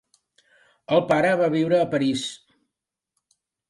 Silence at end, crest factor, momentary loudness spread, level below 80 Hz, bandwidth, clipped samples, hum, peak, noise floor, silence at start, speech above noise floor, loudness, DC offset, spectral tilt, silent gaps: 1.35 s; 18 dB; 7 LU; -66 dBFS; 11.5 kHz; under 0.1%; none; -6 dBFS; -85 dBFS; 0.9 s; 65 dB; -22 LUFS; under 0.1%; -5.5 dB/octave; none